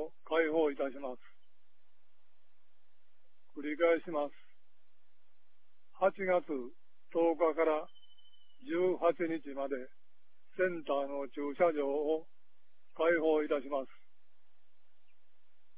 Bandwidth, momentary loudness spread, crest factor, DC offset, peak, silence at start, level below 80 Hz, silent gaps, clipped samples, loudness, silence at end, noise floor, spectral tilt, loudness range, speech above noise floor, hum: 4 kHz; 14 LU; 20 dB; 0.6%; -16 dBFS; 0 s; -76 dBFS; none; under 0.1%; -34 LUFS; 1.9 s; -81 dBFS; -3.5 dB/octave; 5 LU; 48 dB; none